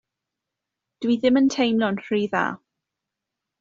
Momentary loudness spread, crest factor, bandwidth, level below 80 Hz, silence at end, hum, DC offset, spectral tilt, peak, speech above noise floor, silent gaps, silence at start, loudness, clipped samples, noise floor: 10 LU; 20 dB; 7.6 kHz; -66 dBFS; 1.05 s; none; under 0.1%; -4 dB/octave; -6 dBFS; 64 dB; none; 1 s; -22 LUFS; under 0.1%; -85 dBFS